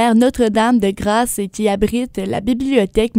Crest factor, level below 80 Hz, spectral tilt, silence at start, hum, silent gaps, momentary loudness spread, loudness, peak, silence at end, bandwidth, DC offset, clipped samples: 16 dB; -36 dBFS; -5 dB/octave; 0 s; none; none; 7 LU; -16 LUFS; 0 dBFS; 0 s; 16 kHz; under 0.1%; under 0.1%